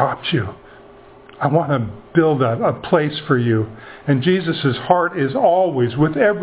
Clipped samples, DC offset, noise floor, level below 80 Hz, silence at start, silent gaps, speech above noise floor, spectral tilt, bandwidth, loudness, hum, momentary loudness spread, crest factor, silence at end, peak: under 0.1%; under 0.1%; -43 dBFS; -50 dBFS; 0 s; none; 26 dB; -11 dB/octave; 4 kHz; -18 LUFS; none; 6 LU; 18 dB; 0 s; 0 dBFS